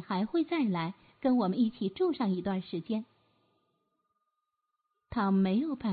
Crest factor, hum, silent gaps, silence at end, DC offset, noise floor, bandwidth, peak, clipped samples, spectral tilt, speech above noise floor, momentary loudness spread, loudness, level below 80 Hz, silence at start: 16 dB; none; none; 0 s; under 0.1%; -83 dBFS; 4.8 kHz; -16 dBFS; under 0.1%; -11 dB/octave; 53 dB; 8 LU; -31 LUFS; -64 dBFS; 0 s